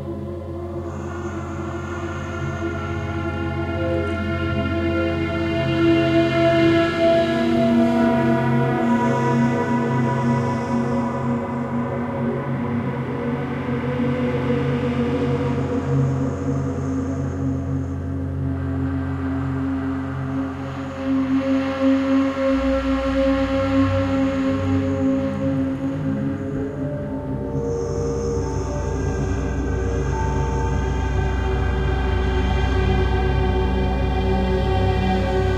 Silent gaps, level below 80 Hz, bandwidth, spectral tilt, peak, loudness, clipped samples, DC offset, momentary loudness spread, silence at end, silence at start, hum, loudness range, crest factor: none; -30 dBFS; 10 kHz; -7.5 dB/octave; -6 dBFS; -22 LUFS; under 0.1%; under 0.1%; 9 LU; 0 s; 0 s; none; 7 LU; 16 dB